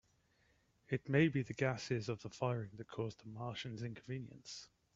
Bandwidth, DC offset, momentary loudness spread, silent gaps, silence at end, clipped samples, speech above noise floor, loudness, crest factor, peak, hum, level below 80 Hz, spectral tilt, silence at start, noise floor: 7.8 kHz; under 0.1%; 15 LU; none; 0.3 s; under 0.1%; 35 dB; -40 LUFS; 22 dB; -18 dBFS; none; -72 dBFS; -6.5 dB/octave; 0.9 s; -75 dBFS